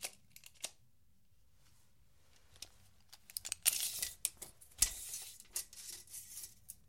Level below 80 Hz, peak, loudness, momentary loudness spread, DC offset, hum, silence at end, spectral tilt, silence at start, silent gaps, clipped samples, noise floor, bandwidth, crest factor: -64 dBFS; -12 dBFS; -39 LUFS; 21 LU; under 0.1%; none; 0.15 s; 1.5 dB/octave; 0 s; none; under 0.1%; -74 dBFS; 16.5 kHz; 34 dB